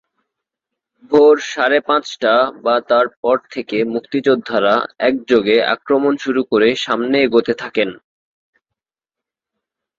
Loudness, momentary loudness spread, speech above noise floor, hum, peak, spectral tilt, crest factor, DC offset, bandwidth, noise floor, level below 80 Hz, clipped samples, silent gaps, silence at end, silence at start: -16 LUFS; 7 LU; 72 dB; none; 0 dBFS; -4.5 dB/octave; 16 dB; under 0.1%; 7.6 kHz; -87 dBFS; -60 dBFS; under 0.1%; 3.17-3.23 s; 2.05 s; 1.1 s